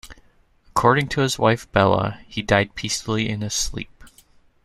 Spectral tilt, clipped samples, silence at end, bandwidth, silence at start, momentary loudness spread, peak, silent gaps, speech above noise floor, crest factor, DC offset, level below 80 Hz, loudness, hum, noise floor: -4.5 dB/octave; under 0.1%; 0.55 s; 14.5 kHz; 0.05 s; 9 LU; -2 dBFS; none; 35 dB; 20 dB; under 0.1%; -42 dBFS; -21 LUFS; none; -56 dBFS